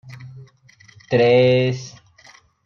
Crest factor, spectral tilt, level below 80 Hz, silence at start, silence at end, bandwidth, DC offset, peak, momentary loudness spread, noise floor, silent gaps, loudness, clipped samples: 16 dB; -6.5 dB/octave; -62 dBFS; 0.05 s; 0.75 s; 7 kHz; under 0.1%; -4 dBFS; 25 LU; -51 dBFS; none; -17 LUFS; under 0.1%